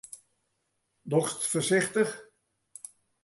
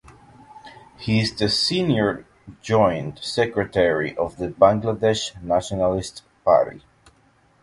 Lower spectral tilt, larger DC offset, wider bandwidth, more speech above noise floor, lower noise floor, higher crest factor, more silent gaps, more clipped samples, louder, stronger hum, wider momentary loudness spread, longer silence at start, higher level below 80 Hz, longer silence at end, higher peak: about the same, -4 dB/octave vs -5 dB/octave; neither; about the same, 12 kHz vs 11.5 kHz; first, 50 dB vs 38 dB; first, -78 dBFS vs -59 dBFS; about the same, 20 dB vs 22 dB; neither; neither; second, -28 LUFS vs -21 LUFS; neither; first, 22 LU vs 10 LU; second, 0.15 s vs 0.55 s; second, -74 dBFS vs -48 dBFS; first, 1 s vs 0.85 s; second, -12 dBFS vs 0 dBFS